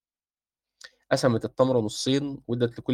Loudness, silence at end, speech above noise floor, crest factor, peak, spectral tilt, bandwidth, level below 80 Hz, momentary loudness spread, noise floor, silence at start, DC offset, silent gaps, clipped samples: -26 LUFS; 0 s; over 65 dB; 20 dB; -8 dBFS; -5.5 dB/octave; 16 kHz; -62 dBFS; 5 LU; under -90 dBFS; 1.1 s; under 0.1%; none; under 0.1%